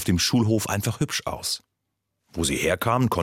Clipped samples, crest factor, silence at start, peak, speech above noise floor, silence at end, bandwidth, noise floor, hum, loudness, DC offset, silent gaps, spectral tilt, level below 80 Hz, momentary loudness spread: under 0.1%; 18 dB; 0 s; -8 dBFS; 56 dB; 0 s; 16.5 kHz; -79 dBFS; none; -24 LUFS; under 0.1%; none; -4.5 dB/octave; -48 dBFS; 8 LU